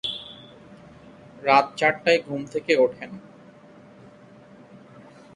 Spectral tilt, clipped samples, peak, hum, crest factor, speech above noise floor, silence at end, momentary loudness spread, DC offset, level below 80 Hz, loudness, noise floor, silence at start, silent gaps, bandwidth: -4.5 dB/octave; under 0.1%; -4 dBFS; none; 24 dB; 27 dB; 2.15 s; 21 LU; under 0.1%; -66 dBFS; -22 LUFS; -49 dBFS; 0.05 s; none; 11 kHz